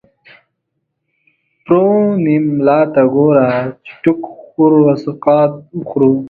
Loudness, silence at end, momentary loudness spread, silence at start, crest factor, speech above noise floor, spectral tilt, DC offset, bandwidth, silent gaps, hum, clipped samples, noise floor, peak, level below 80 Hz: -13 LUFS; 0 s; 10 LU; 1.7 s; 14 dB; 59 dB; -10.5 dB/octave; under 0.1%; 4.8 kHz; none; none; under 0.1%; -71 dBFS; 0 dBFS; -56 dBFS